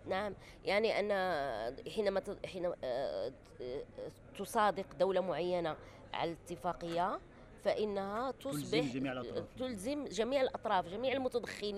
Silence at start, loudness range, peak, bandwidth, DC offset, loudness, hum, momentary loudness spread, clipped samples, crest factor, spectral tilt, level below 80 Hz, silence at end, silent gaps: 0 s; 2 LU; -20 dBFS; 14.5 kHz; under 0.1%; -37 LUFS; none; 11 LU; under 0.1%; 18 dB; -5 dB/octave; -62 dBFS; 0 s; none